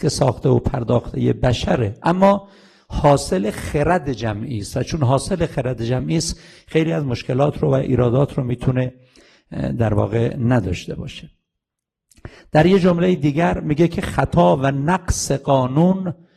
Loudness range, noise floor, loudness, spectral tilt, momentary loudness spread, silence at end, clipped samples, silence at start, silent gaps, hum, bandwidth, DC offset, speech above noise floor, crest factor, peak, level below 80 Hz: 4 LU; -83 dBFS; -19 LUFS; -6.5 dB/octave; 9 LU; 0.25 s; under 0.1%; 0 s; none; none; 13 kHz; under 0.1%; 65 dB; 16 dB; -2 dBFS; -36 dBFS